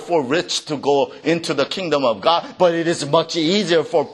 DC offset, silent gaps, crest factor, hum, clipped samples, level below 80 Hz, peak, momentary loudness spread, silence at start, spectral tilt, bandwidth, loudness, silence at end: under 0.1%; none; 18 dB; none; under 0.1%; -64 dBFS; -2 dBFS; 4 LU; 0 s; -4 dB/octave; 12 kHz; -19 LUFS; 0 s